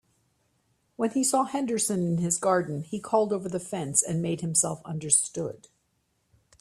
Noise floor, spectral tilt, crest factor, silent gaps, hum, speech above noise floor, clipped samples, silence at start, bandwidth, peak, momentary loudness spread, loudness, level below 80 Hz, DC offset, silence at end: -73 dBFS; -4.5 dB/octave; 24 dB; none; none; 46 dB; under 0.1%; 1 s; 15 kHz; -4 dBFS; 10 LU; -26 LUFS; -66 dBFS; under 0.1%; 1.05 s